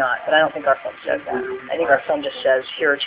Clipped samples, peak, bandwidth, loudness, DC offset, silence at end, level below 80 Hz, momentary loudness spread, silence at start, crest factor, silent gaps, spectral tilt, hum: under 0.1%; -2 dBFS; 4 kHz; -20 LUFS; under 0.1%; 0 s; -60 dBFS; 8 LU; 0 s; 18 dB; none; -7 dB/octave; none